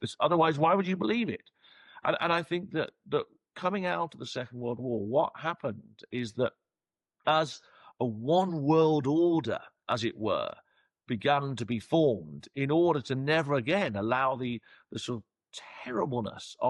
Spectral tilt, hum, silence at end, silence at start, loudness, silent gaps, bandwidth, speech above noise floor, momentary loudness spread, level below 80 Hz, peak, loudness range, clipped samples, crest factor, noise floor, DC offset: -6.5 dB/octave; none; 0 s; 0 s; -30 LUFS; none; 11.5 kHz; over 61 dB; 13 LU; -72 dBFS; -14 dBFS; 4 LU; under 0.1%; 16 dB; under -90 dBFS; under 0.1%